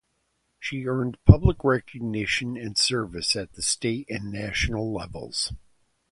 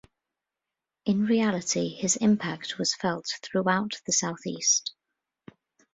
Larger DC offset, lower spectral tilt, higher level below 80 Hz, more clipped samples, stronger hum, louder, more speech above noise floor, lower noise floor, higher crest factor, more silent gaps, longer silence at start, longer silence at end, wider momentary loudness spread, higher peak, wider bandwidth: neither; first, -4.5 dB/octave vs -3 dB/octave; first, -36 dBFS vs -68 dBFS; neither; neither; about the same, -25 LUFS vs -26 LUFS; second, 49 dB vs 61 dB; second, -73 dBFS vs -88 dBFS; first, 26 dB vs 20 dB; neither; second, 0.6 s vs 1.05 s; second, 0.55 s vs 1.05 s; first, 13 LU vs 9 LU; first, 0 dBFS vs -10 dBFS; first, 11.5 kHz vs 8 kHz